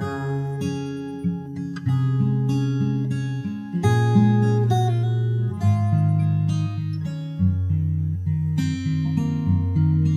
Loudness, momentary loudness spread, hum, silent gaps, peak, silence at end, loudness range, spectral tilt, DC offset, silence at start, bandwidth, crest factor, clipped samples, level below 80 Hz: -22 LUFS; 9 LU; none; none; -6 dBFS; 0 s; 4 LU; -8.5 dB/octave; under 0.1%; 0 s; 10 kHz; 14 dB; under 0.1%; -48 dBFS